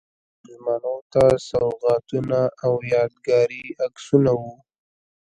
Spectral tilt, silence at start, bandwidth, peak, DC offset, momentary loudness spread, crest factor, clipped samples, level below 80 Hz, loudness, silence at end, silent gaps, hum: -7 dB/octave; 0.5 s; 11 kHz; -2 dBFS; under 0.1%; 10 LU; 20 dB; under 0.1%; -52 dBFS; -21 LUFS; 0.85 s; 1.02-1.10 s; none